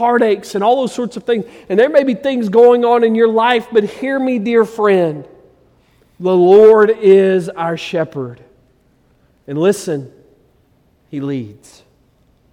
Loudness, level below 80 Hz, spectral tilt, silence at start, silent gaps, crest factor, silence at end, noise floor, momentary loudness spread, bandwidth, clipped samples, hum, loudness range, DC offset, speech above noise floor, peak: -13 LUFS; -60 dBFS; -6 dB/octave; 0 s; none; 14 dB; 1 s; -55 dBFS; 14 LU; 13 kHz; under 0.1%; none; 11 LU; under 0.1%; 42 dB; 0 dBFS